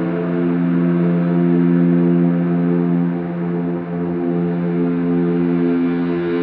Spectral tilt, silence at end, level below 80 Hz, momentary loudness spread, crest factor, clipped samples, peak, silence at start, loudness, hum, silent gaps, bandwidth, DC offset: -9.5 dB/octave; 0 s; -58 dBFS; 7 LU; 12 dB; under 0.1%; -4 dBFS; 0 s; -17 LUFS; none; none; 4.1 kHz; under 0.1%